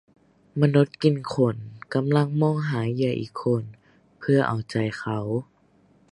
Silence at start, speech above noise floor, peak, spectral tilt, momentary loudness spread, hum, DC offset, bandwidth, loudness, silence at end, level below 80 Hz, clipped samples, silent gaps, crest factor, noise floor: 0.55 s; 37 dB; -4 dBFS; -8 dB/octave; 9 LU; none; under 0.1%; 11 kHz; -24 LUFS; 0.7 s; -62 dBFS; under 0.1%; none; 20 dB; -60 dBFS